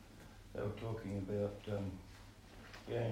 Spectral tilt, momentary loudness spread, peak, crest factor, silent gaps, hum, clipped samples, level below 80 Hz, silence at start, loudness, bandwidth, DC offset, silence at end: -7.5 dB/octave; 17 LU; -28 dBFS; 16 dB; none; none; under 0.1%; -60 dBFS; 0 s; -43 LUFS; 16 kHz; under 0.1%; 0 s